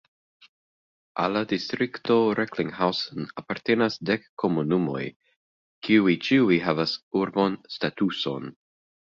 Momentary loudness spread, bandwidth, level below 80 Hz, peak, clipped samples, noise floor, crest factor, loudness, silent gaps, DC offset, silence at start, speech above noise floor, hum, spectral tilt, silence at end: 12 LU; 7.4 kHz; -64 dBFS; -6 dBFS; under 0.1%; under -90 dBFS; 20 dB; -25 LUFS; 4.29-4.37 s, 5.16-5.20 s, 5.36-5.82 s, 7.03-7.11 s; under 0.1%; 1.15 s; over 65 dB; none; -6.5 dB/octave; 0.55 s